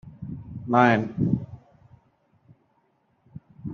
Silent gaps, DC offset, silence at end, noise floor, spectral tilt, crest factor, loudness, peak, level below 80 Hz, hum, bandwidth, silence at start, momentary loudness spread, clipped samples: none; under 0.1%; 0 s; -68 dBFS; -6 dB/octave; 24 dB; -23 LUFS; -4 dBFS; -56 dBFS; none; 6.8 kHz; 0.05 s; 22 LU; under 0.1%